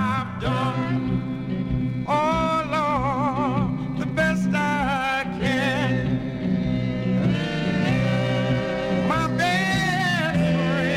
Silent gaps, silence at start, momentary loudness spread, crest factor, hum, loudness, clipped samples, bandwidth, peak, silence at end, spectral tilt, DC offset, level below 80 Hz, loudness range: none; 0 s; 5 LU; 12 dB; none; -23 LUFS; under 0.1%; 13.5 kHz; -12 dBFS; 0 s; -6.5 dB/octave; under 0.1%; -42 dBFS; 2 LU